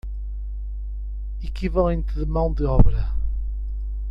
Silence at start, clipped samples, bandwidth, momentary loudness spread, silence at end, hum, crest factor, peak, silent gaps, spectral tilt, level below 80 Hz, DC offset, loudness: 0.05 s; under 0.1%; 5.4 kHz; 13 LU; 0 s; 50 Hz at -25 dBFS; 22 dB; 0 dBFS; none; -10 dB/octave; -24 dBFS; under 0.1%; -26 LUFS